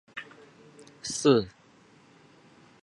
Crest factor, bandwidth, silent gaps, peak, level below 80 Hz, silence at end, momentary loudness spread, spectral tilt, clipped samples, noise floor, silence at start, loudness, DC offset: 24 dB; 11.5 kHz; none; -8 dBFS; -66 dBFS; 1.35 s; 20 LU; -4.5 dB/octave; under 0.1%; -58 dBFS; 0.15 s; -26 LUFS; under 0.1%